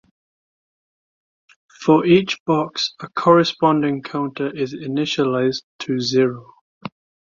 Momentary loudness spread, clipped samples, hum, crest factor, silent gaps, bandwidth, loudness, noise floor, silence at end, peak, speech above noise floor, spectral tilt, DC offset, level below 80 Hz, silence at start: 13 LU; under 0.1%; none; 18 dB; 2.40-2.46 s, 5.63-5.79 s, 6.61-6.81 s; 7.6 kHz; -19 LUFS; under -90 dBFS; 0.35 s; -2 dBFS; over 72 dB; -6 dB/octave; under 0.1%; -60 dBFS; 1.8 s